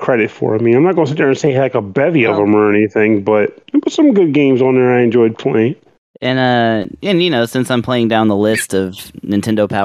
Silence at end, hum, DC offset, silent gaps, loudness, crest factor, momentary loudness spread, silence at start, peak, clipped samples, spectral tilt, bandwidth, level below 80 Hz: 0 s; none; under 0.1%; 5.98-6.14 s; -13 LUFS; 12 dB; 7 LU; 0 s; -2 dBFS; under 0.1%; -6 dB/octave; 14.5 kHz; -56 dBFS